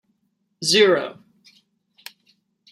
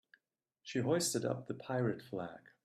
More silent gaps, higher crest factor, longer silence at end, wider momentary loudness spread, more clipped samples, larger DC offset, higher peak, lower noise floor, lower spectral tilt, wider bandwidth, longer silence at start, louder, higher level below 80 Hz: neither; about the same, 22 dB vs 18 dB; first, 1.6 s vs 0.25 s; first, 27 LU vs 12 LU; neither; neither; first, -2 dBFS vs -20 dBFS; second, -71 dBFS vs -84 dBFS; second, -2.5 dB/octave vs -4.5 dB/octave; about the same, 15 kHz vs 15 kHz; about the same, 0.6 s vs 0.65 s; first, -18 LUFS vs -37 LUFS; about the same, -72 dBFS vs -76 dBFS